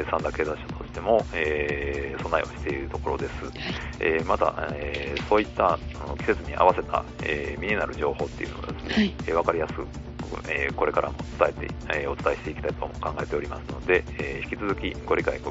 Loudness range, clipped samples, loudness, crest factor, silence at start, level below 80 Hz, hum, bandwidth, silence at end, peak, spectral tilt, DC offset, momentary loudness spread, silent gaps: 3 LU; under 0.1%; -27 LUFS; 24 dB; 0 s; -40 dBFS; 60 Hz at -45 dBFS; 8 kHz; 0 s; -4 dBFS; -4 dB/octave; under 0.1%; 9 LU; none